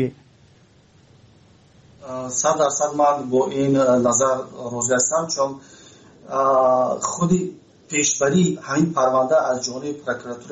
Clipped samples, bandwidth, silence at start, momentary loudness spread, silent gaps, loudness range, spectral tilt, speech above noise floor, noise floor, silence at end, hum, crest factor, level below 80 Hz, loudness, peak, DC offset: under 0.1%; 8.2 kHz; 0 s; 11 LU; none; 3 LU; -4.5 dB/octave; 33 dB; -53 dBFS; 0 s; none; 16 dB; -60 dBFS; -20 LUFS; -6 dBFS; under 0.1%